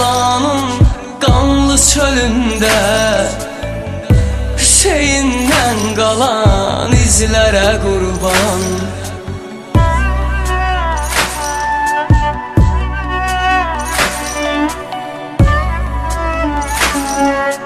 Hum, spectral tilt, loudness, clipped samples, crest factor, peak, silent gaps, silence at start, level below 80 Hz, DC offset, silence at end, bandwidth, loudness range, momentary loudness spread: none; -4 dB/octave; -13 LUFS; under 0.1%; 12 dB; 0 dBFS; none; 0 s; -20 dBFS; under 0.1%; 0 s; 14 kHz; 4 LU; 9 LU